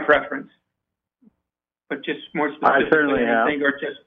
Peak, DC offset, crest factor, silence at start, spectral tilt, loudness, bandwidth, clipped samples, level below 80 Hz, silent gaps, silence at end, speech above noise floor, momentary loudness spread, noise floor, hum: -2 dBFS; under 0.1%; 20 dB; 0 s; -7.5 dB/octave; -20 LUFS; 5.4 kHz; under 0.1%; -56 dBFS; none; 0.1 s; 64 dB; 14 LU; -85 dBFS; none